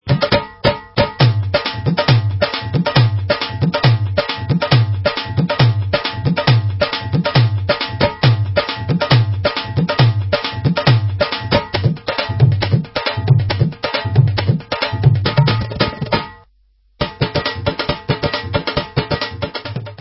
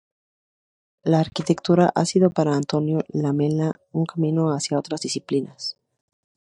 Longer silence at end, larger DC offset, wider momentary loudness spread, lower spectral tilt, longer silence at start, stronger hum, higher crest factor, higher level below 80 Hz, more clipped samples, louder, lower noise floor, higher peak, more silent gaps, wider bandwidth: second, 0.05 s vs 0.85 s; neither; about the same, 6 LU vs 8 LU; first, -9.5 dB/octave vs -6 dB/octave; second, 0.05 s vs 1.05 s; neither; about the same, 16 dB vs 20 dB; first, -34 dBFS vs -64 dBFS; neither; first, -16 LUFS vs -22 LUFS; second, -55 dBFS vs under -90 dBFS; first, 0 dBFS vs -4 dBFS; neither; second, 5.8 kHz vs 11 kHz